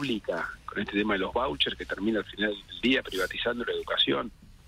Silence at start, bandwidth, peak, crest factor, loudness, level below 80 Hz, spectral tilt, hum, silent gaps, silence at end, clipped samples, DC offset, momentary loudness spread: 0 s; 16 kHz; -12 dBFS; 18 dB; -29 LUFS; -52 dBFS; -4.5 dB/octave; none; none; 0 s; under 0.1%; under 0.1%; 7 LU